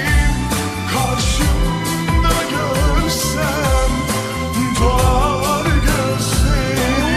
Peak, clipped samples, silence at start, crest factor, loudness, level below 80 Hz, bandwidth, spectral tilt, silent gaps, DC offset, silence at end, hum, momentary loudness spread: -2 dBFS; under 0.1%; 0 s; 14 dB; -17 LUFS; -20 dBFS; 15 kHz; -4.5 dB/octave; none; under 0.1%; 0 s; none; 4 LU